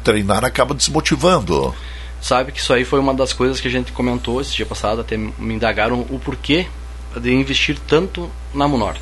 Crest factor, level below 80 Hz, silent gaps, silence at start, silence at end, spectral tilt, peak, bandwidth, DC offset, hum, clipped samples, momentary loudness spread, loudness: 18 dB; -30 dBFS; none; 0 s; 0 s; -4.5 dB/octave; 0 dBFS; 12 kHz; under 0.1%; none; under 0.1%; 10 LU; -18 LUFS